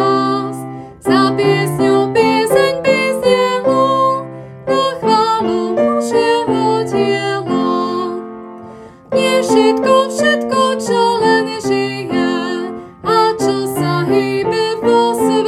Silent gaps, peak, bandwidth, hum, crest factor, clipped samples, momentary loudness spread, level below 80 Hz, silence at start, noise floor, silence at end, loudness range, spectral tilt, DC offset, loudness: none; 0 dBFS; 14.5 kHz; none; 14 dB; under 0.1%; 10 LU; -52 dBFS; 0 s; -35 dBFS; 0 s; 3 LU; -5 dB/octave; under 0.1%; -14 LUFS